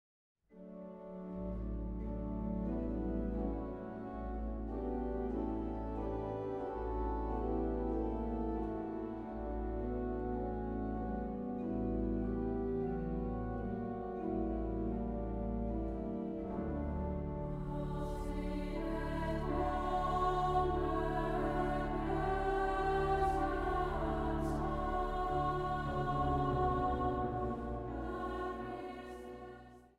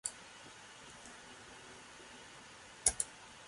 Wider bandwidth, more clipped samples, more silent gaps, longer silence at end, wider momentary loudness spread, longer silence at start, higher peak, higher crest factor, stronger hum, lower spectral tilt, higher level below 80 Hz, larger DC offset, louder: about the same, 11.5 kHz vs 11.5 kHz; neither; neither; about the same, 0.1 s vs 0 s; second, 8 LU vs 19 LU; first, 0.5 s vs 0.05 s; second, -22 dBFS vs -12 dBFS; second, 16 dB vs 34 dB; neither; first, -8.5 dB/octave vs 0 dB/octave; first, -44 dBFS vs -64 dBFS; neither; second, -38 LUFS vs -35 LUFS